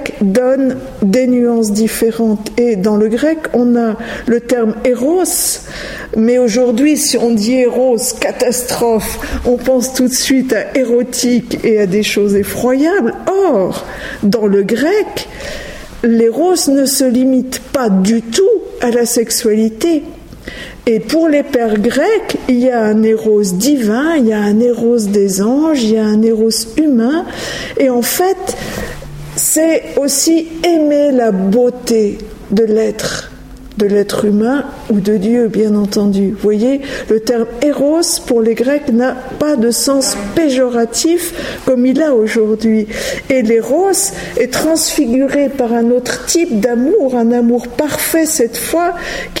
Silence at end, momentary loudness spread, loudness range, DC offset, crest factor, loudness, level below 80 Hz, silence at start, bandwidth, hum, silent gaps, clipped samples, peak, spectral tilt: 0 s; 7 LU; 2 LU; under 0.1%; 12 dB; -13 LUFS; -38 dBFS; 0 s; 16.5 kHz; none; none; under 0.1%; 0 dBFS; -4.5 dB/octave